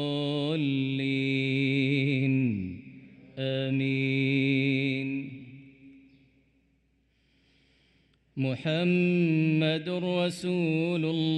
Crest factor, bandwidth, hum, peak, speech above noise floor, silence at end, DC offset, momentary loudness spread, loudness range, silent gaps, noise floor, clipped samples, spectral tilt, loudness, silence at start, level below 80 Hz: 14 dB; 11.5 kHz; none; -14 dBFS; 43 dB; 0 s; under 0.1%; 10 LU; 9 LU; none; -69 dBFS; under 0.1%; -7.5 dB/octave; -27 LUFS; 0 s; -70 dBFS